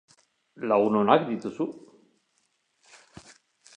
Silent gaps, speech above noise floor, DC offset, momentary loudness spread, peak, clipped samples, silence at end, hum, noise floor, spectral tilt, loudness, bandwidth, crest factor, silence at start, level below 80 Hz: none; 48 dB; under 0.1%; 14 LU; -4 dBFS; under 0.1%; 2 s; none; -72 dBFS; -6.5 dB/octave; -25 LUFS; 10 kHz; 24 dB; 0.6 s; -72 dBFS